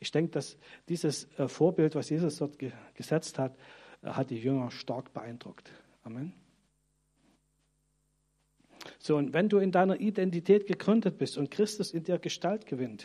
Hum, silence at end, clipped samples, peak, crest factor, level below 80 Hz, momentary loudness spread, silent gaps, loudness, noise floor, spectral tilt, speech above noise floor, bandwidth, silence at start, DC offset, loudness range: none; 0 s; under 0.1%; -12 dBFS; 20 dB; -76 dBFS; 17 LU; none; -31 LUFS; -75 dBFS; -6 dB/octave; 44 dB; 13 kHz; 0 s; under 0.1%; 19 LU